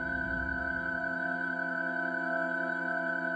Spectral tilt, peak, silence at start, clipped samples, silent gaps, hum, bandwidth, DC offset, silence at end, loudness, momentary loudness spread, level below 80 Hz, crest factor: -7 dB/octave; -20 dBFS; 0 s; under 0.1%; none; none; 9 kHz; under 0.1%; 0 s; -32 LUFS; 1 LU; -52 dBFS; 12 dB